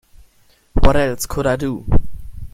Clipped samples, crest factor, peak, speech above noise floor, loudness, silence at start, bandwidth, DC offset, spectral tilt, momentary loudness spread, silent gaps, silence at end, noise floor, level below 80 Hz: under 0.1%; 16 dB; 0 dBFS; 39 dB; -19 LUFS; 0.75 s; 14.5 kHz; under 0.1%; -5.5 dB/octave; 14 LU; none; 0.05 s; -54 dBFS; -22 dBFS